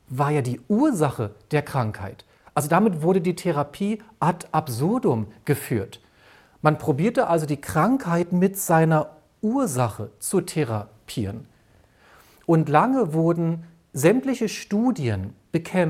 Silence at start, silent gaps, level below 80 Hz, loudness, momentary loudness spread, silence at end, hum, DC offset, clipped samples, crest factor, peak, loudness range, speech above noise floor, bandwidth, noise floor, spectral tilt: 0.1 s; none; -58 dBFS; -23 LUFS; 11 LU; 0 s; none; under 0.1%; under 0.1%; 20 dB; -2 dBFS; 4 LU; 35 dB; 16 kHz; -57 dBFS; -6.5 dB/octave